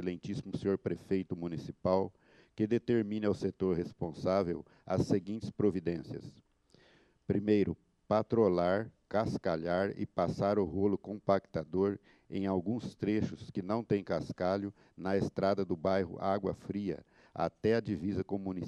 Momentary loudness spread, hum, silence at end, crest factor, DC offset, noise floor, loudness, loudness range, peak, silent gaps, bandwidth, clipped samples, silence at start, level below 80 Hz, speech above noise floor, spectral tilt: 9 LU; none; 0 s; 20 dB; under 0.1%; -66 dBFS; -34 LUFS; 3 LU; -14 dBFS; none; 10.5 kHz; under 0.1%; 0 s; -62 dBFS; 33 dB; -8 dB/octave